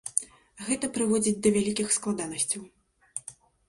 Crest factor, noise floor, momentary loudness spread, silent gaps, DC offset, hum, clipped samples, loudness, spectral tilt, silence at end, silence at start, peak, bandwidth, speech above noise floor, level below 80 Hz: 26 dB; -49 dBFS; 15 LU; none; under 0.1%; none; under 0.1%; -27 LUFS; -3.5 dB/octave; 0.35 s; 0.05 s; -4 dBFS; 11.5 kHz; 22 dB; -62 dBFS